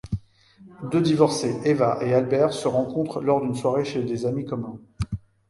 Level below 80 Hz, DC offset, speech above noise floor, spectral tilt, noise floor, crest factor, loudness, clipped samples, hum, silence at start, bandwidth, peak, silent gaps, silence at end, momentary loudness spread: -48 dBFS; under 0.1%; 29 dB; -6.5 dB/octave; -52 dBFS; 20 dB; -24 LUFS; under 0.1%; none; 0.05 s; 11.5 kHz; -2 dBFS; none; 0.3 s; 12 LU